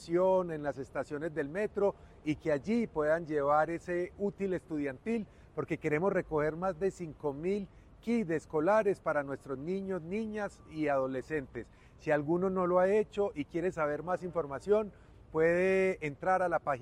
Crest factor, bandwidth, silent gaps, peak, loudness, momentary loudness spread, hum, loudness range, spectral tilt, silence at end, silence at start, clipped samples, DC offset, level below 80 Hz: 16 dB; 11.5 kHz; none; -16 dBFS; -33 LUFS; 10 LU; none; 3 LU; -7.5 dB/octave; 0 s; 0 s; under 0.1%; under 0.1%; -60 dBFS